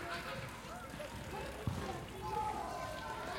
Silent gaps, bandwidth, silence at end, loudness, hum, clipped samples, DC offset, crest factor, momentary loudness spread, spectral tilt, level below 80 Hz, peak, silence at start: none; 16.5 kHz; 0 s; -43 LUFS; none; under 0.1%; under 0.1%; 18 dB; 7 LU; -4.5 dB/octave; -56 dBFS; -24 dBFS; 0 s